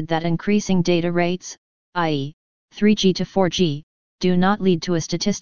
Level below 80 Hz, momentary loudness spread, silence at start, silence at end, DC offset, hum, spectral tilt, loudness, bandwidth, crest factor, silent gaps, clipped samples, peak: -48 dBFS; 10 LU; 0 s; 0 s; 2%; none; -5.5 dB/octave; -20 LUFS; 7.2 kHz; 16 dB; 1.58-1.93 s, 2.33-2.68 s, 3.83-4.18 s; under 0.1%; -4 dBFS